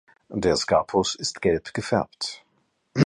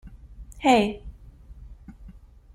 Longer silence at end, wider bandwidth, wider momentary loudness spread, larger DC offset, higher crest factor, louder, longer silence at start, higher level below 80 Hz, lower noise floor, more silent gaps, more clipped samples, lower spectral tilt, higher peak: second, 0 s vs 0.45 s; second, 11 kHz vs 14.5 kHz; second, 11 LU vs 27 LU; neither; about the same, 22 dB vs 22 dB; second, -25 LUFS vs -22 LUFS; first, 0.3 s vs 0.05 s; about the same, -50 dBFS vs -46 dBFS; first, -69 dBFS vs -47 dBFS; neither; neither; about the same, -4.5 dB/octave vs -5 dB/octave; about the same, -4 dBFS vs -4 dBFS